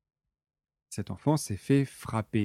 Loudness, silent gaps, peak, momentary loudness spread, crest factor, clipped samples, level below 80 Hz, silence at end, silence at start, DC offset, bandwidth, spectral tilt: -30 LUFS; none; -12 dBFS; 12 LU; 18 dB; under 0.1%; -60 dBFS; 0 s; 0.9 s; under 0.1%; 14.5 kHz; -6.5 dB/octave